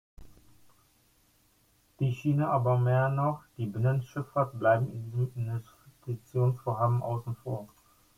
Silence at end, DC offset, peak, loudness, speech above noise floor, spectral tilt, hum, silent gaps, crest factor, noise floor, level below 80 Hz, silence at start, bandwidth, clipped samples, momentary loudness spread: 0.5 s; under 0.1%; -12 dBFS; -30 LUFS; 38 dB; -9 dB/octave; none; none; 18 dB; -67 dBFS; -62 dBFS; 0.2 s; 12 kHz; under 0.1%; 11 LU